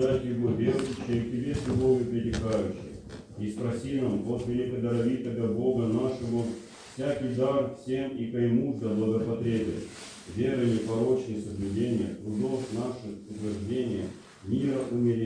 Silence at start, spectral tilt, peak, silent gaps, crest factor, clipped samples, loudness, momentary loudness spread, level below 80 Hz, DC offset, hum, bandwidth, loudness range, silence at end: 0 s; -7.5 dB/octave; -12 dBFS; none; 16 dB; under 0.1%; -29 LUFS; 10 LU; -52 dBFS; under 0.1%; none; 10.5 kHz; 2 LU; 0 s